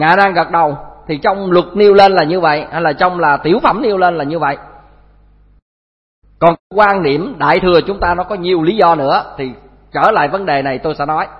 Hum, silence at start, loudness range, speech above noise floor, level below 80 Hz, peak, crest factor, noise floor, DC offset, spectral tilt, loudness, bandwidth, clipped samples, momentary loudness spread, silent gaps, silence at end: 50 Hz at -45 dBFS; 0 s; 5 LU; 34 dB; -40 dBFS; 0 dBFS; 14 dB; -46 dBFS; under 0.1%; -7.5 dB/octave; -12 LUFS; 6 kHz; 0.1%; 8 LU; 5.62-6.22 s, 6.59-6.70 s; 0 s